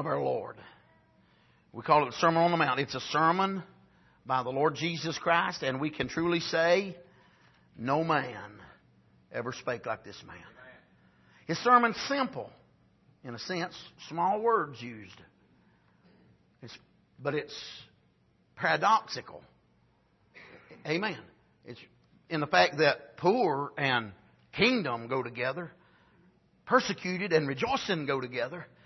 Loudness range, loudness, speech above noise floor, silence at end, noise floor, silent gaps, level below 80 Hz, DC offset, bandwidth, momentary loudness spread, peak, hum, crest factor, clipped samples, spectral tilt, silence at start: 8 LU; -29 LUFS; 38 dB; 0.2 s; -68 dBFS; none; -68 dBFS; under 0.1%; 6.2 kHz; 22 LU; -8 dBFS; none; 22 dB; under 0.1%; -5 dB/octave; 0 s